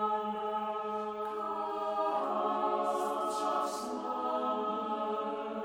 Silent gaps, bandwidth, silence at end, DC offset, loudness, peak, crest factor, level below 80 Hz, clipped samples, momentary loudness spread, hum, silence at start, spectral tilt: none; over 20 kHz; 0 s; under 0.1%; -34 LUFS; -20 dBFS; 14 dB; -76 dBFS; under 0.1%; 5 LU; none; 0 s; -4.5 dB/octave